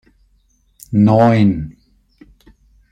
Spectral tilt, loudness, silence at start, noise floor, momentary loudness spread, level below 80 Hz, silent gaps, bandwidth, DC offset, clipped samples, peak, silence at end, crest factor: -9 dB/octave; -14 LUFS; 0.9 s; -58 dBFS; 14 LU; -44 dBFS; none; 13 kHz; under 0.1%; under 0.1%; -2 dBFS; 1.2 s; 16 dB